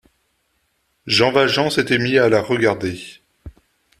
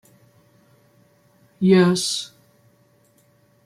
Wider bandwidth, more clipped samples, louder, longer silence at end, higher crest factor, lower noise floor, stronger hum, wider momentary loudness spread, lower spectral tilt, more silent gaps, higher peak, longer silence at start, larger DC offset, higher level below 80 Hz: about the same, 14 kHz vs 15 kHz; neither; about the same, -17 LUFS vs -19 LUFS; second, 0.5 s vs 1.4 s; about the same, 18 dB vs 20 dB; first, -67 dBFS vs -59 dBFS; neither; first, 16 LU vs 13 LU; about the same, -4.5 dB/octave vs -5 dB/octave; neither; first, 0 dBFS vs -4 dBFS; second, 1.05 s vs 1.6 s; neither; first, -52 dBFS vs -68 dBFS